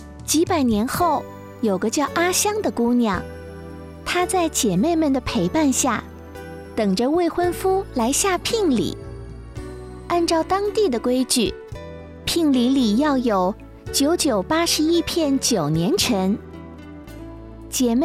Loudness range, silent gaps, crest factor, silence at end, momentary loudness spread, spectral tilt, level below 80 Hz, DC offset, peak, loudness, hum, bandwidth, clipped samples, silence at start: 3 LU; none; 14 dB; 0 s; 18 LU; -4 dB/octave; -42 dBFS; under 0.1%; -6 dBFS; -20 LUFS; none; 16 kHz; under 0.1%; 0 s